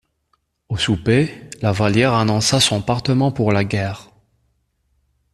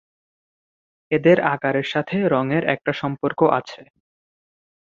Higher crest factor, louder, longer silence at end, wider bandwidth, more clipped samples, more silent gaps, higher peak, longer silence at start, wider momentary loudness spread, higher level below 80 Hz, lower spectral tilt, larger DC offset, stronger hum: about the same, 18 dB vs 20 dB; about the same, -18 LUFS vs -20 LUFS; first, 1.3 s vs 1.05 s; first, 13.5 kHz vs 7.4 kHz; neither; neither; about the same, -2 dBFS vs -2 dBFS; second, 0.7 s vs 1.1 s; about the same, 9 LU vs 8 LU; first, -46 dBFS vs -62 dBFS; second, -5 dB/octave vs -7.5 dB/octave; neither; neither